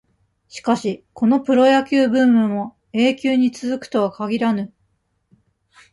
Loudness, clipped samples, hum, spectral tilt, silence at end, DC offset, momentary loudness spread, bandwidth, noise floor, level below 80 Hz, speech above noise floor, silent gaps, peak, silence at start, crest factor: -18 LUFS; under 0.1%; none; -6 dB/octave; 1.25 s; under 0.1%; 12 LU; 11.5 kHz; -67 dBFS; -62 dBFS; 49 dB; none; -2 dBFS; 0.55 s; 16 dB